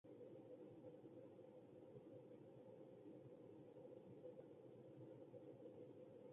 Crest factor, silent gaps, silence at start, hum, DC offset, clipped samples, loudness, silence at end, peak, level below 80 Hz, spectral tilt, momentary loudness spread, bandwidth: 14 dB; none; 0.05 s; none; under 0.1%; under 0.1%; -62 LUFS; 0 s; -48 dBFS; under -90 dBFS; -8 dB/octave; 2 LU; 3.7 kHz